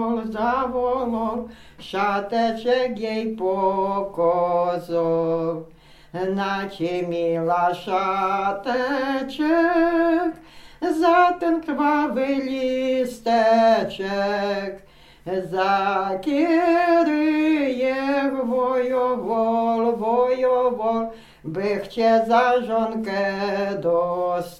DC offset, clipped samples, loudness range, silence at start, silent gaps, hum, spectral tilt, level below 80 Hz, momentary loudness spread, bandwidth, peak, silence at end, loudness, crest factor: under 0.1%; under 0.1%; 3 LU; 0 s; none; none; -6 dB/octave; -54 dBFS; 8 LU; 14 kHz; -4 dBFS; 0.05 s; -22 LUFS; 16 dB